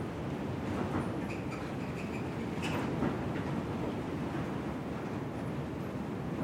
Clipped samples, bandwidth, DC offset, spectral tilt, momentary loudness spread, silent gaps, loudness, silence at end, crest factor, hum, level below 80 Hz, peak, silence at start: under 0.1%; 16 kHz; under 0.1%; -7 dB/octave; 4 LU; none; -37 LUFS; 0 s; 16 dB; none; -54 dBFS; -20 dBFS; 0 s